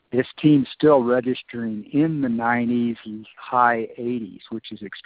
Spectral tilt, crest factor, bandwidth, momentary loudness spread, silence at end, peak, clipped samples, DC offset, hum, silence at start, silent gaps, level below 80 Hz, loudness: -5.5 dB/octave; 18 dB; 4.8 kHz; 16 LU; 0.05 s; -4 dBFS; under 0.1%; under 0.1%; none; 0.15 s; none; -62 dBFS; -21 LUFS